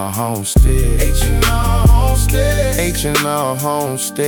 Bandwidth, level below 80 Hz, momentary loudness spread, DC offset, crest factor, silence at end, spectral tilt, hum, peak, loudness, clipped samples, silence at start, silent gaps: 19 kHz; -16 dBFS; 6 LU; under 0.1%; 14 dB; 0 s; -4.5 dB/octave; none; 0 dBFS; -15 LUFS; under 0.1%; 0 s; none